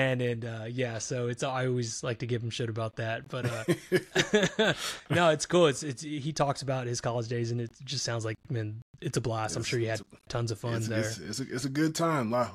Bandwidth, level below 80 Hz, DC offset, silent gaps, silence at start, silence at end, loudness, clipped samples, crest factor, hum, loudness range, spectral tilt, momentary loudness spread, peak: 15 kHz; -60 dBFS; under 0.1%; 8.82-8.94 s; 0 s; 0 s; -31 LUFS; under 0.1%; 20 dB; none; 5 LU; -5 dB/octave; 10 LU; -10 dBFS